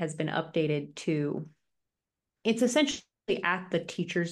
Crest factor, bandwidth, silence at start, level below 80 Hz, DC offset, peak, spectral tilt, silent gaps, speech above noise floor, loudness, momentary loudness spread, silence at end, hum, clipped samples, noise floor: 18 dB; 12.5 kHz; 0 s; -70 dBFS; under 0.1%; -12 dBFS; -5 dB/octave; none; 59 dB; -30 LUFS; 8 LU; 0 s; none; under 0.1%; -89 dBFS